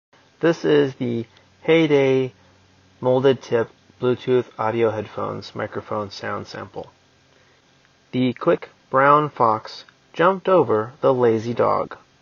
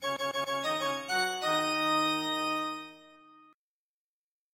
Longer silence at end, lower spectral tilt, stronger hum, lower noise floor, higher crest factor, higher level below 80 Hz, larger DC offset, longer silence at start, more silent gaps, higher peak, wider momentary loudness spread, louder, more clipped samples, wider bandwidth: second, 0.25 s vs 1.45 s; first, -5 dB/octave vs -2 dB/octave; neither; second, -57 dBFS vs under -90 dBFS; about the same, 20 dB vs 16 dB; first, -66 dBFS vs -82 dBFS; neither; first, 0.4 s vs 0 s; neither; first, 0 dBFS vs -16 dBFS; first, 14 LU vs 7 LU; first, -21 LUFS vs -30 LUFS; neither; second, 7 kHz vs 16.5 kHz